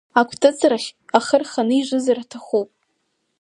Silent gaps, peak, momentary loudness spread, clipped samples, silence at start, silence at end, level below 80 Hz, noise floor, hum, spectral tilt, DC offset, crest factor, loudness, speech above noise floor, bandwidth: none; 0 dBFS; 8 LU; under 0.1%; 0.15 s; 0.75 s; -66 dBFS; -71 dBFS; none; -3.5 dB/octave; under 0.1%; 20 dB; -19 LUFS; 52 dB; 11.5 kHz